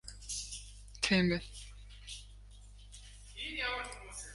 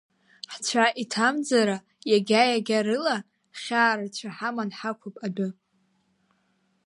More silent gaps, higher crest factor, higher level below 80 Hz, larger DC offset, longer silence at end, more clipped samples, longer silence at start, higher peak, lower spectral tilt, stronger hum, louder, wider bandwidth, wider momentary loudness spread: neither; about the same, 24 dB vs 20 dB; first, -52 dBFS vs -80 dBFS; neither; second, 0 s vs 1.35 s; neither; second, 0.05 s vs 0.5 s; second, -16 dBFS vs -6 dBFS; about the same, -4 dB/octave vs -3.5 dB/octave; first, 50 Hz at -50 dBFS vs none; second, -36 LUFS vs -25 LUFS; about the same, 11.5 kHz vs 11.5 kHz; first, 24 LU vs 13 LU